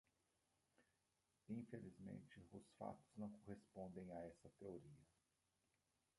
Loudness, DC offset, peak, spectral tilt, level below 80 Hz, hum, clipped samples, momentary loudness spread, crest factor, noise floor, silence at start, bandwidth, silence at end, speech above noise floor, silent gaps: -58 LUFS; under 0.1%; -38 dBFS; -8 dB/octave; -82 dBFS; none; under 0.1%; 7 LU; 20 dB; -88 dBFS; 0.8 s; 11 kHz; 1.15 s; 31 dB; none